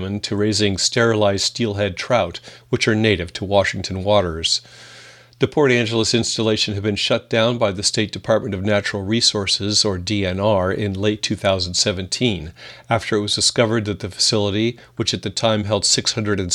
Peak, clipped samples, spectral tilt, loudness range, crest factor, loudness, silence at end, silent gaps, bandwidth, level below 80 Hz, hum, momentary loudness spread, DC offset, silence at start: -2 dBFS; under 0.1%; -3.5 dB/octave; 1 LU; 18 dB; -19 LUFS; 0 s; none; 13 kHz; -48 dBFS; none; 6 LU; under 0.1%; 0 s